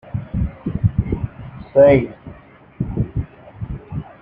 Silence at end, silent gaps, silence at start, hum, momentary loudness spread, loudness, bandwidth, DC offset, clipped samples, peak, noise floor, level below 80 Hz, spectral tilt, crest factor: 0.1 s; none; 0.05 s; none; 22 LU; -19 LUFS; 3.7 kHz; under 0.1%; under 0.1%; -2 dBFS; -43 dBFS; -34 dBFS; -11.5 dB/octave; 18 dB